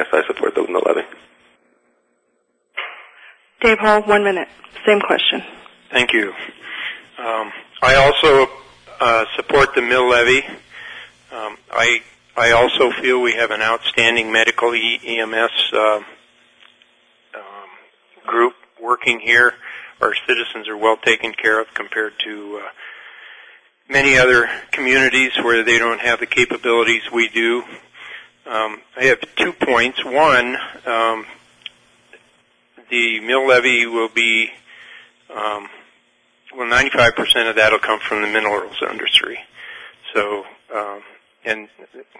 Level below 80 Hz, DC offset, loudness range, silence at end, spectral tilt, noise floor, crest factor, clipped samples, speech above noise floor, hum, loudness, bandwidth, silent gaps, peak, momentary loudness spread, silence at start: -46 dBFS; under 0.1%; 6 LU; 0.15 s; -3 dB/octave; -66 dBFS; 18 dB; under 0.1%; 49 dB; none; -16 LUFS; 10.5 kHz; none; 0 dBFS; 19 LU; 0 s